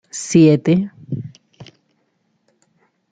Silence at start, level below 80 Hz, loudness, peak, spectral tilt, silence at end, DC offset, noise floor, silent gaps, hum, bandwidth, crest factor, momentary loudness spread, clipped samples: 0.15 s; -60 dBFS; -16 LUFS; -2 dBFS; -6.5 dB/octave; 1.5 s; under 0.1%; -66 dBFS; none; none; 9.4 kHz; 18 dB; 17 LU; under 0.1%